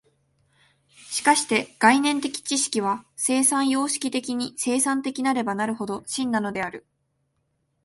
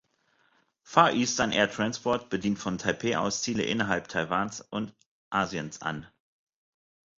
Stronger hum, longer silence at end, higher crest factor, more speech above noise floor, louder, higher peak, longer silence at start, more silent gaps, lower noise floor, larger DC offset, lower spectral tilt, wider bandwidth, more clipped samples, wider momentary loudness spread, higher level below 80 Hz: neither; about the same, 1.05 s vs 1.15 s; second, 20 dB vs 26 dB; first, 49 dB vs 41 dB; first, -23 LUFS vs -28 LUFS; about the same, -4 dBFS vs -4 dBFS; first, 1.05 s vs 0.85 s; second, none vs 5.06-5.31 s; first, -73 dBFS vs -69 dBFS; neither; second, -2 dB/octave vs -4 dB/octave; first, 12 kHz vs 7.8 kHz; neither; about the same, 10 LU vs 12 LU; second, -68 dBFS vs -60 dBFS